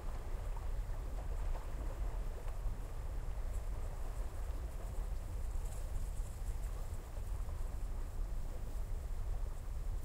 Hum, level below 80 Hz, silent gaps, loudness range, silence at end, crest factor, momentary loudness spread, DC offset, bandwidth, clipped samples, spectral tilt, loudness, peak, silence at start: none; -40 dBFS; none; 1 LU; 0 s; 12 dB; 2 LU; under 0.1%; 16 kHz; under 0.1%; -6 dB/octave; -46 LUFS; -28 dBFS; 0 s